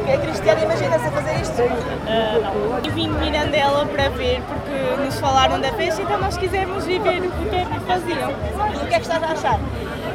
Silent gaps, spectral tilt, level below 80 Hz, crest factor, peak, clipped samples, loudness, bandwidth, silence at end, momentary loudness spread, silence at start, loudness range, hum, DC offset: none; -5 dB/octave; -34 dBFS; 18 dB; -2 dBFS; under 0.1%; -20 LUFS; 16.5 kHz; 0 s; 5 LU; 0 s; 2 LU; none; under 0.1%